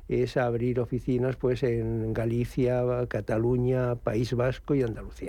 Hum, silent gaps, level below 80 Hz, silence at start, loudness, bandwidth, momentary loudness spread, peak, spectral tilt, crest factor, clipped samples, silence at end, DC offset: none; none; -44 dBFS; 0 s; -28 LUFS; 11.5 kHz; 3 LU; -12 dBFS; -8.5 dB/octave; 14 dB; under 0.1%; 0 s; under 0.1%